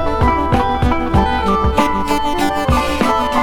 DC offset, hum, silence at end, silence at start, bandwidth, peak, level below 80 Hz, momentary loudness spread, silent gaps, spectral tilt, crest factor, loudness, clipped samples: 4%; none; 0 s; 0 s; 17.5 kHz; 0 dBFS; -24 dBFS; 2 LU; none; -6 dB/octave; 14 dB; -16 LUFS; under 0.1%